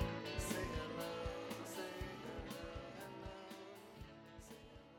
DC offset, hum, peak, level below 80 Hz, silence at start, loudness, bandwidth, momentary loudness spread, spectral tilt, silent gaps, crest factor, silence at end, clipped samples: under 0.1%; none; -26 dBFS; -56 dBFS; 0 s; -47 LUFS; 19 kHz; 14 LU; -4.5 dB/octave; none; 20 dB; 0 s; under 0.1%